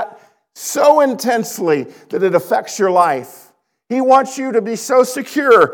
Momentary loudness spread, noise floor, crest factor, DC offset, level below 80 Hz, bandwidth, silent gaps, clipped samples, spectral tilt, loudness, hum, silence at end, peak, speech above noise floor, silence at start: 11 LU; -43 dBFS; 14 dB; under 0.1%; -66 dBFS; 19.5 kHz; none; under 0.1%; -4 dB/octave; -15 LUFS; none; 0 s; 0 dBFS; 29 dB; 0 s